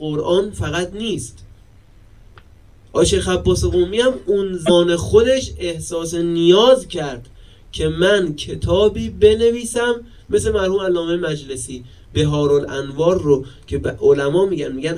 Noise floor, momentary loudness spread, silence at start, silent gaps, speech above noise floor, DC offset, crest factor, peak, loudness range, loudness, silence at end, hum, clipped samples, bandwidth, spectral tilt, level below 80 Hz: -47 dBFS; 12 LU; 0 s; none; 30 dB; 0.3%; 18 dB; 0 dBFS; 4 LU; -17 LUFS; 0 s; none; under 0.1%; 13.5 kHz; -5 dB/octave; -34 dBFS